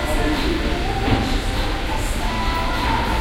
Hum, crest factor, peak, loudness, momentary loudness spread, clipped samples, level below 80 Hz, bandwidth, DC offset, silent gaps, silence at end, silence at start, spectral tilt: none; 16 dB; -4 dBFS; -22 LUFS; 3 LU; under 0.1%; -24 dBFS; 16 kHz; under 0.1%; none; 0 s; 0 s; -5 dB/octave